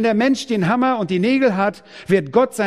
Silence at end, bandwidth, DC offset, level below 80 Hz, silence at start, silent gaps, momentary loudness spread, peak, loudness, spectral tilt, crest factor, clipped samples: 0 s; 14.5 kHz; under 0.1%; -58 dBFS; 0 s; none; 5 LU; -2 dBFS; -18 LUFS; -6 dB/octave; 14 dB; under 0.1%